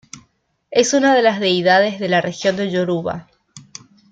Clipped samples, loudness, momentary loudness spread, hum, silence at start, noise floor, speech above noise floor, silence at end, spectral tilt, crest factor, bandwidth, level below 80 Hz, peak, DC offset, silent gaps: under 0.1%; -17 LUFS; 14 LU; none; 0.15 s; -63 dBFS; 46 dB; 0.5 s; -4 dB/octave; 16 dB; 9.4 kHz; -60 dBFS; -2 dBFS; under 0.1%; none